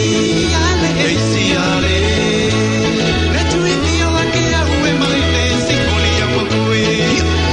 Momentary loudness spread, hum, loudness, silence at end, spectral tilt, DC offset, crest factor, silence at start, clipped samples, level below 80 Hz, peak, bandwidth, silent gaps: 1 LU; none; -14 LUFS; 0 s; -4.5 dB/octave; under 0.1%; 12 dB; 0 s; under 0.1%; -28 dBFS; -2 dBFS; 11 kHz; none